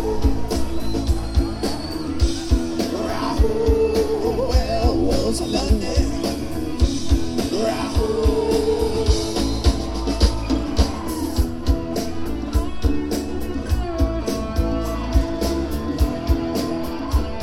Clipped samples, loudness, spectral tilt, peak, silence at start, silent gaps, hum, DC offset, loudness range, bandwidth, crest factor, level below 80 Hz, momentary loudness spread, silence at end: under 0.1%; -22 LUFS; -6 dB/octave; -4 dBFS; 0 s; none; none; under 0.1%; 3 LU; 15.5 kHz; 16 dB; -24 dBFS; 6 LU; 0 s